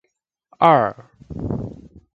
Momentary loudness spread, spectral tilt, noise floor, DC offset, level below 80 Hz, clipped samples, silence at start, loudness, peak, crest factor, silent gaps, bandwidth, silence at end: 20 LU; -8.5 dB/octave; -73 dBFS; under 0.1%; -44 dBFS; under 0.1%; 0.6 s; -19 LUFS; 0 dBFS; 22 dB; none; 7.2 kHz; 0.4 s